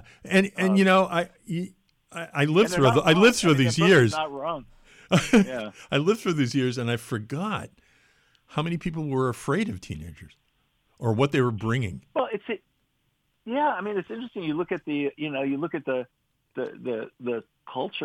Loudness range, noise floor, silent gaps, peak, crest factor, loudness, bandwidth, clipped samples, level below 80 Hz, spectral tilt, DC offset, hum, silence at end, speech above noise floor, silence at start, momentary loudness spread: 9 LU; -72 dBFS; none; -8 dBFS; 18 dB; -25 LUFS; 15.5 kHz; under 0.1%; -56 dBFS; -5.5 dB/octave; under 0.1%; none; 0 s; 48 dB; 0.25 s; 16 LU